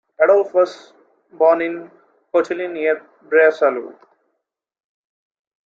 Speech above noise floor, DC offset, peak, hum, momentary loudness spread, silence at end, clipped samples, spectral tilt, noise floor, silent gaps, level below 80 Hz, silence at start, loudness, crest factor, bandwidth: 59 dB; under 0.1%; -2 dBFS; none; 11 LU; 1.75 s; under 0.1%; -5 dB/octave; -76 dBFS; none; -74 dBFS; 0.2 s; -17 LUFS; 18 dB; 7.6 kHz